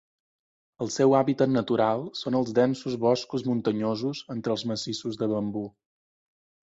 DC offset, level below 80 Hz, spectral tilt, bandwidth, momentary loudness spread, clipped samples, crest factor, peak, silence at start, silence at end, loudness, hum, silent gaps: under 0.1%; -66 dBFS; -6 dB/octave; 8 kHz; 10 LU; under 0.1%; 18 dB; -8 dBFS; 0.8 s; 0.95 s; -26 LUFS; none; none